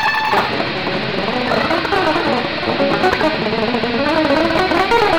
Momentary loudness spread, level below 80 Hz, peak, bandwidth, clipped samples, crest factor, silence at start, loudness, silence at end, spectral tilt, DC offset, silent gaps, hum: 4 LU; -40 dBFS; -4 dBFS; over 20 kHz; under 0.1%; 12 dB; 0 s; -16 LUFS; 0 s; -5 dB/octave; under 0.1%; none; none